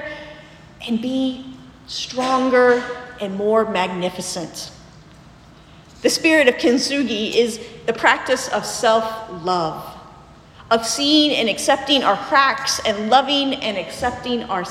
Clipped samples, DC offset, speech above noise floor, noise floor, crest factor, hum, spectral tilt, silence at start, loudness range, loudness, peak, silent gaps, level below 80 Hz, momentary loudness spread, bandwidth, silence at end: under 0.1%; under 0.1%; 26 dB; -45 dBFS; 20 dB; none; -3 dB/octave; 0 s; 4 LU; -18 LUFS; 0 dBFS; none; -52 dBFS; 15 LU; 16 kHz; 0 s